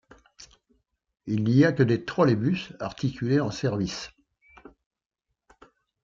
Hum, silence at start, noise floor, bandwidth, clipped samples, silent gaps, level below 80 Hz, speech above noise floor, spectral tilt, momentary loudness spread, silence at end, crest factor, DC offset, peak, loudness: none; 0.4 s; -70 dBFS; 7.6 kHz; under 0.1%; none; -60 dBFS; 46 dB; -7 dB/octave; 14 LU; 1.95 s; 20 dB; under 0.1%; -8 dBFS; -25 LUFS